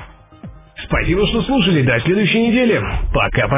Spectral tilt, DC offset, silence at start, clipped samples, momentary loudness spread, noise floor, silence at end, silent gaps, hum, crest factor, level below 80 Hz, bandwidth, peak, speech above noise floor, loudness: -10.5 dB/octave; under 0.1%; 0 s; under 0.1%; 6 LU; -37 dBFS; 0 s; none; none; 14 dB; -28 dBFS; 3.9 kHz; -2 dBFS; 22 dB; -16 LUFS